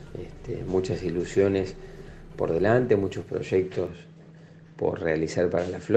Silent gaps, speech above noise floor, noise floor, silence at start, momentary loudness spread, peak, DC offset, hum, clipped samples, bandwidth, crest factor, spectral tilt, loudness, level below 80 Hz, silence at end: none; 23 dB; -49 dBFS; 0 s; 18 LU; -6 dBFS; under 0.1%; none; under 0.1%; 8.8 kHz; 20 dB; -7 dB/octave; -26 LUFS; -48 dBFS; 0 s